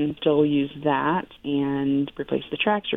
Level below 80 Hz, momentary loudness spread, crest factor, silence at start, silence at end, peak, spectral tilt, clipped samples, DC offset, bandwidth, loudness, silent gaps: -58 dBFS; 7 LU; 16 dB; 0 s; 0 s; -8 dBFS; -8.5 dB/octave; under 0.1%; under 0.1%; 3.9 kHz; -24 LUFS; none